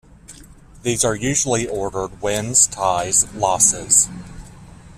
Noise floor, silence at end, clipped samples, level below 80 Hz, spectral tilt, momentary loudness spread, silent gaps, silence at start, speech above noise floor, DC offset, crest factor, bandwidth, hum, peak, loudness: -43 dBFS; 0.05 s; under 0.1%; -44 dBFS; -2.5 dB/octave; 10 LU; none; 0.3 s; 24 dB; under 0.1%; 20 dB; 15.5 kHz; none; 0 dBFS; -17 LUFS